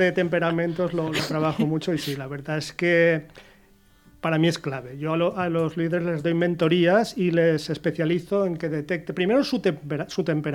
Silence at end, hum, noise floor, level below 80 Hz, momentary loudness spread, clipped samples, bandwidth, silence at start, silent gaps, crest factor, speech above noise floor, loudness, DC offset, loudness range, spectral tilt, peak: 0 s; none; -56 dBFS; -58 dBFS; 9 LU; under 0.1%; 16.5 kHz; 0 s; none; 16 dB; 33 dB; -24 LUFS; under 0.1%; 3 LU; -6.5 dB/octave; -8 dBFS